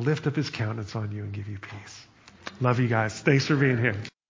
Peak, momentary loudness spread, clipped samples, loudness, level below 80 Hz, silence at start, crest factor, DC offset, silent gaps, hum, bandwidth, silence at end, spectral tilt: -8 dBFS; 20 LU; under 0.1%; -26 LUFS; -56 dBFS; 0 s; 20 dB; under 0.1%; none; none; 7.6 kHz; 0.2 s; -6.5 dB/octave